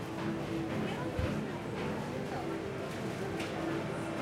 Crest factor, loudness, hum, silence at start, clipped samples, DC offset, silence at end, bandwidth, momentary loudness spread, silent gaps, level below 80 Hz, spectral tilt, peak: 16 dB; -37 LUFS; none; 0 s; under 0.1%; under 0.1%; 0 s; 16 kHz; 3 LU; none; -52 dBFS; -6 dB/octave; -20 dBFS